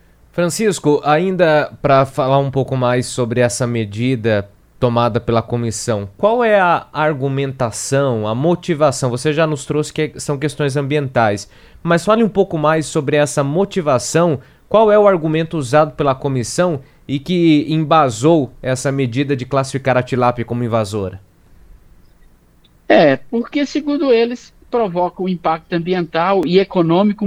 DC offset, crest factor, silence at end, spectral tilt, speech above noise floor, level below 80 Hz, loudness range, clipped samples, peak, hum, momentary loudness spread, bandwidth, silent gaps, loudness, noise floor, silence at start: under 0.1%; 16 dB; 0 s; -6 dB/octave; 35 dB; -46 dBFS; 4 LU; under 0.1%; 0 dBFS; none; 7 LU; 15.5 kHz; none; -16 LUFS; -50 dBFS; 0.35 s